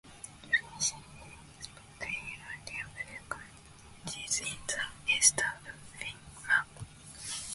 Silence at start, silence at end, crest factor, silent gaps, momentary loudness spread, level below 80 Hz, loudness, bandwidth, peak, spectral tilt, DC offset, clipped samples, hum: 0.05 s; 0 s; 28 dB; none; 21 LU; -60 dBFS; -32 LUFS; 12 kHz; -8 dBFS; 0 dB/octave; under 0.1%; under 0.1%; none